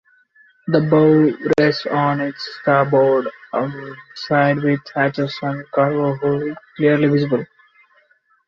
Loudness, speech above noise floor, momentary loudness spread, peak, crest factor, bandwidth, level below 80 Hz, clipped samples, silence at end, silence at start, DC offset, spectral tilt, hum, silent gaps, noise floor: -18 LUFS; 41 dB; 11 LU; -2 dBFS; 16 dB; 7 kHz; -60 dBFS; under 0.1%; 1 s; 0.65 s; under 0.1%; -8 dB/octave; none; none; -58 dBFS